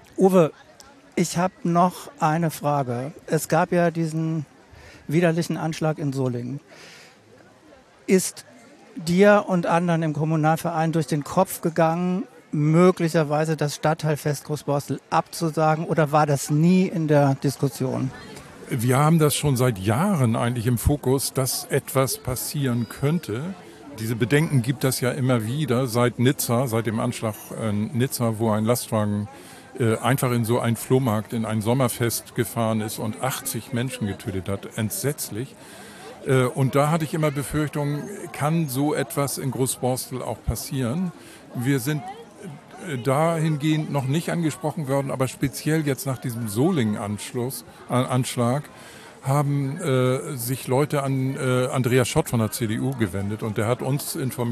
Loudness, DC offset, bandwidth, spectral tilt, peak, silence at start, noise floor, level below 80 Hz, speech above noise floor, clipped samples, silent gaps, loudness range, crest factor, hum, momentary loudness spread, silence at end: -23 LUFS; under 0.1%; 14 kHz; -6 dB/octave; -4 dBFS; 0.15 s; -51 dBFS; -50 dBFS; 29 dB; under 0.1%; none; 5 LU; 18 dB; none; 10 LU; 0 s